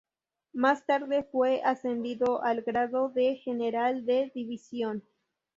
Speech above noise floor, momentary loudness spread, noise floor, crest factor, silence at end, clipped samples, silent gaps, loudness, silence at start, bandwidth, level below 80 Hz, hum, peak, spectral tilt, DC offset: 32 dB; 8 LU; -61 dBFS; 18 dB; 0.6 s; under 0.1%; none; -29 LUFS; 0.55 s; 7.6 kHz; -72 dBFS; none; -10 dBFS; -5.5 dB/octave; under 0.1%